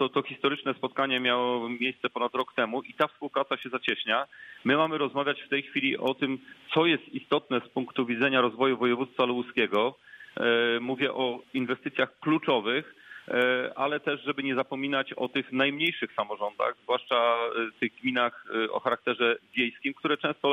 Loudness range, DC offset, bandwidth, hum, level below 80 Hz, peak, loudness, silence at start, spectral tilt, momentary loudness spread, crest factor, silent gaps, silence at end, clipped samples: 2 LU; under 0.1%; 14 kHz; none; -76 dBFS; -10 dBFS; -28 LUFS; 0 s; -6 dB/octave; 6 LU; 18 dB; none; 0 s; under 0.1%